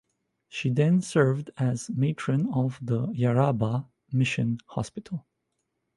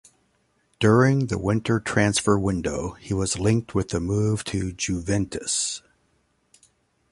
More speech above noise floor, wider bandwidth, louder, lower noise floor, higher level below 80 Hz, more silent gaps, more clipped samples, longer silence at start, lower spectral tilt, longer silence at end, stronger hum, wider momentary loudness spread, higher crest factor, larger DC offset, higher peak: first, 53 dB vs 45 dB; about the same, 11.5 kHz vs 11.5 kHz; second, -27 LUFS vs -23 LUFS; first, -79 dBFS vs -67 dBFS; second, -60 dBFS vs -44 dBFS; neither; neither; second, 0.55 s vs 0.8 s; first, -7 dB/octave vs -5 dB/octave; second, 0.75 s vs 1.3 s; neither; about the same, 11 LU vs 9 LU; about the same, 18 dB vs 20 dB; neither; second, -8 dBFS vs -4 dBFS